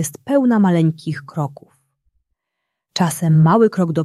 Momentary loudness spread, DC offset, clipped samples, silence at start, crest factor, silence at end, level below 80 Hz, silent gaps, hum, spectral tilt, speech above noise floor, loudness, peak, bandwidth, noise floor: 13 LU; under 0.1%; under 0.1%; 0 s; 14 dB; 0 s; -60 dBFS; none; none; -7 dB/octave; 62 dB; -16 LUFS; -2 dBFS; 14 kHz; -78 dBFS